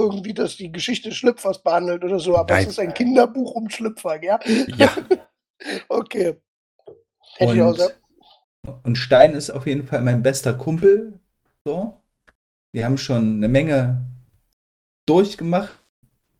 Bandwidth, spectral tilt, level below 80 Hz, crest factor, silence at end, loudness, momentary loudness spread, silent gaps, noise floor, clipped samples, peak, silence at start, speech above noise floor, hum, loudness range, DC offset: 16 kHz; -6 dB/octave; -50 dBFS; 20 dB; 0.7 s; -20 LUFS; 12 LU; 5.50-5.54 s, 6.48-6.79 s, 8.44-8.63 s, 11.61-11.65 s, 12.35-12.73 s, 14.53-15.07 s; -48 dBFS; under 0.1%; 0 dBFS; 0 s; 29 dB; none; 4 LU; under 0.1%